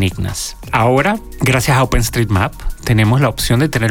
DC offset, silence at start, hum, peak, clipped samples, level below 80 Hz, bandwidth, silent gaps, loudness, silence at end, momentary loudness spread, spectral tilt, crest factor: under 0.1%; 0 s; none; -2 dBFS; under 0.1%; -26 dBFS; 18 kHz; none; -15 LUFS; 0 s; 8 LU; -5 dB/octave; 12 dB